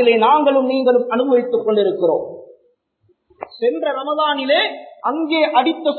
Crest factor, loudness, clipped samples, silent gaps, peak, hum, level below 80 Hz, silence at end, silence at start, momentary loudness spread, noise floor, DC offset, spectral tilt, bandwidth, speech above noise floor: 14 dB; -17 LUFS; under 0.1%; none; -2 dBFS; none; -72 dBFS; 0 s; 0 s; 10 LU; -62 dBFS; under 0.1%; -9.5 dB/octave; 4.5 kHz; 46 dB